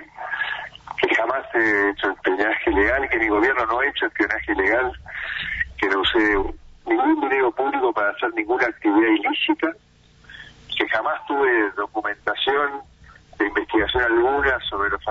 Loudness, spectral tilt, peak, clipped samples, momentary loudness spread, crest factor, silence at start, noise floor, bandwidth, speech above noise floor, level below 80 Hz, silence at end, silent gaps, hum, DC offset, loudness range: -21 LUFS; -5.5 dB/octave; -6 dBFS; under 0.1%; 9 LU; 16 dB; 0 s; -47 dBFS; 7.6 kHz; 26 dB; -42 dBFS; 0 s; none; none; under 0.1%; 3 LU